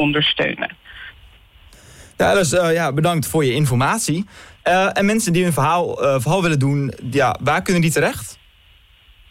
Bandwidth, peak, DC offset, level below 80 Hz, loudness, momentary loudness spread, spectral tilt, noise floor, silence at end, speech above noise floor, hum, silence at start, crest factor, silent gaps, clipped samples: 16 kHz; -8 dBFS; under 0.1%; -46 dBFS; -18 LUFS; 11 LU; -5 dB/octave; -51 dBFS; 0.95 s; 33 dB; none; 0 s; 10 dB; none; under 0.1%